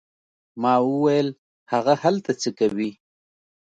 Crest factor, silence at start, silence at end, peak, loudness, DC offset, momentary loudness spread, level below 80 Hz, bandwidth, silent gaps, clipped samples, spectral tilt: 18 dB; 0.55 s; 0.85 s; -4 dBFS; -22 LUFS; under 0.1%; 8 LU; -70 dBFS; 9 kHz; 1.38-1.66 s; under 0.1%; -6 dB/octave